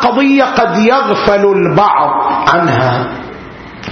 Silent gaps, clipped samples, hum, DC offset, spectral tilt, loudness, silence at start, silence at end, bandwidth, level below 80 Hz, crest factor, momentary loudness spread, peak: none; 0.1%; none; under 0.1%; -6.5 dB/octave; -10 LUFS; 0 s; 0 s; 6.6 kHz; -42 dBFS; 10 dB; 17 LU; 0 dBFS